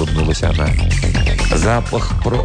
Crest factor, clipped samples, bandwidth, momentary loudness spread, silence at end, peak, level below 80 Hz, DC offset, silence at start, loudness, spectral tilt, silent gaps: 10 dB; under 0.1%; 10 kHz; 3 LU; 0 s; -4 dBFS; -18 dBFS; under 0.1%; 0 s; -17 LUFS; -5.5 dB/octave; none